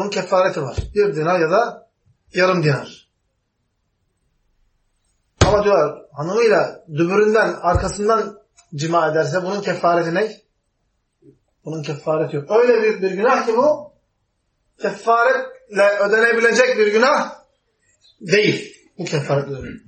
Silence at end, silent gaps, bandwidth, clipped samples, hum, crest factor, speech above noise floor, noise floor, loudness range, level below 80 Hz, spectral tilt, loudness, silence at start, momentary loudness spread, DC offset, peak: 0.1 s; none; 8.8 kHz; under 0.1%; none; 20 dB; 53 dB; -70 dBFS; 6 LU; -40 dBFS; -5 dB/octave; -18 LUFS; 0 s; 12 LU; under 0.1%; 0 dBFS